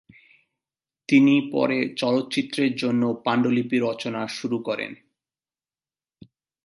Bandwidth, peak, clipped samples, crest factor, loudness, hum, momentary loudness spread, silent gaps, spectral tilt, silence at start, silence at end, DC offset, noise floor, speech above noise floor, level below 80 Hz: 11.5 kHz; -6 dBFS; under 0.1%; 18 dB; -23 LUFS; none; 11 LU; none; -6 dB/octave; 1.1 s; 1.7 s; under 0.1%; under -90 dBFS; over 68 dB; -72 dBFS